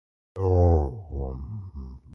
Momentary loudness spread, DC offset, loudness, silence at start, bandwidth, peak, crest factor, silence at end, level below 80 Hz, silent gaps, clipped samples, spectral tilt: 20 LU; under 0.1%; -25 LUFS; 0.35 s; 5.8 kHz; -8 dBFS; 16 dB; 0.15 s; -30 dBFS; none; under 0.1%; -11.5 dB/octave